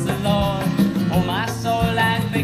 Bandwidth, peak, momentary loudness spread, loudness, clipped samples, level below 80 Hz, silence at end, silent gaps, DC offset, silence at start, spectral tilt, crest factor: 16 kHz; -6 dBFS; 4 LU; -20 LUFS; under 0.1%; -36 dBFS; 0 s; none; under 0.1%; 0 s; -6 dB/octave; 14 dB